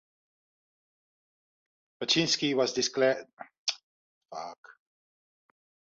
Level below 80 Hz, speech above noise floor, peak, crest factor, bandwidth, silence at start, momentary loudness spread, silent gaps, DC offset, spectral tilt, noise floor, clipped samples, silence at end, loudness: -74 dBFS; over 61 dB; -12 dBFS; 22 dB; 7.8 kHz; 2 s; 19 LU; 3.33-3.37 s, 3.58-3.66 s, 3.83-4.21 s, 4.58-4.63 s; under 0.1%; -3 dB/octave; under -90 dBFS; under 0.1%; 1.25 s; -28 LUFS